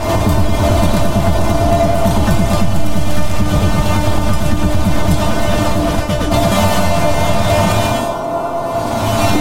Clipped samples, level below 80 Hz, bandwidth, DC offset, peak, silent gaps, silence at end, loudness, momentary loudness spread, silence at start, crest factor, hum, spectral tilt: under 0.1%; -22 dBFS; 17 kHz; 10%; 0 dBFS; none; 0 s; -15 LUFS; 5 LU; 0 s; 14 dB; none; -5.5 dB/octave